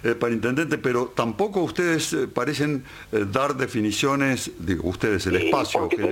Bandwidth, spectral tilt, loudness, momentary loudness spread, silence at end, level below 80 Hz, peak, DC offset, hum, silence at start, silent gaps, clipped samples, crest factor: 17 kHz; -5 dB/octave; -24 LUFS; 5 LU; 0 s; -50 dBFS; -4 dBFS; under 0.1%; none; 0 s; none; under 0.1%; 18 dB